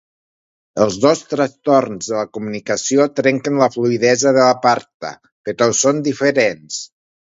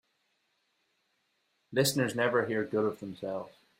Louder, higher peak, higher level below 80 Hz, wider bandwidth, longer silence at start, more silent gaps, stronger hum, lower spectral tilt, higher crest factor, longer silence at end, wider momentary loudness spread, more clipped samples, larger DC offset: first, -16 LUFS vs -31 LUFS; first, 0 dBFS vs -14 dBFS; first, -60 dBFS vs -72 dBFS; second, 8 kHz vs 16 kHz; second, 0.75 s vs 1.7 s; first, 4.94-5.00 s, 5.32-5.44 s vs none; neither; about the same, -4 dB/octave vs -4.5 dB/octave; about the same, 16 dB vs 20 dB; first, 0.55 s vs 0.3 s; first, 15 LU vs 10 LU; neither; neither